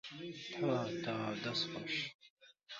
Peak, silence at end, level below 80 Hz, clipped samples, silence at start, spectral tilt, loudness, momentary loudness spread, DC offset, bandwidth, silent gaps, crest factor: -24 dBFS; 0 s; -78 dBFS; under 0.1%; 0.05 s; -3 dB/octave; -39 LUFS; 9 LU; under 0.1%; 7.4 kHz; 2.14-2.19 s, 2.30-2.37 s; 18 dB